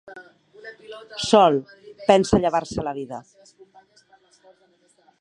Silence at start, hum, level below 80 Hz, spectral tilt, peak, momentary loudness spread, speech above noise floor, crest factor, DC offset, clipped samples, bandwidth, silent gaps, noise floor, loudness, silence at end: 0.05 s; none; -48 dBFS; -5 dB/octave; 0 dBFS; 26 LU; 40 dB; 24 dB; under 0.1%; under 0.1%; 11 kHz; none; -61 dBFS; -20 LUFS; 2 s